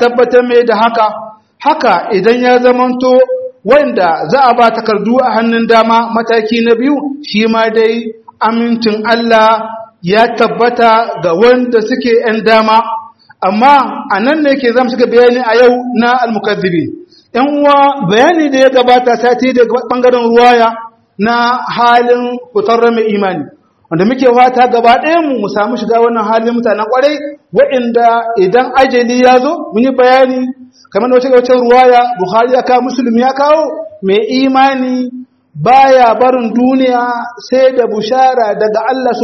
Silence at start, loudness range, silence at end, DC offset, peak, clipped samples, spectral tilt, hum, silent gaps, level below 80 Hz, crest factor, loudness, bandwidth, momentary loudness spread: 0 s; 2 LU; 0 s; under 0.1%; 0 dBFS; 0.5%; -5.5 dB/octave; none; none; -52 dBFS; 8 dB; -9 LUFS; 6.4 kHz; 8 LU